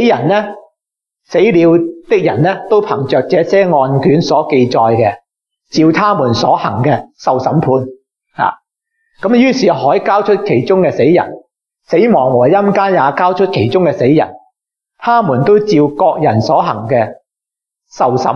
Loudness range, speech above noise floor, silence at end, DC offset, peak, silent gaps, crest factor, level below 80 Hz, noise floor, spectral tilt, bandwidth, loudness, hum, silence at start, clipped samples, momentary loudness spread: 2 LU; 74 dB; 0 s; under 0.1%; 0 dBFS; none; 12 dB; -54 dBFS; -84 dBFS; -7 dB/octave; 7 kHz; -12 LUFS; none; 0 s; under 0.1%; 6 LU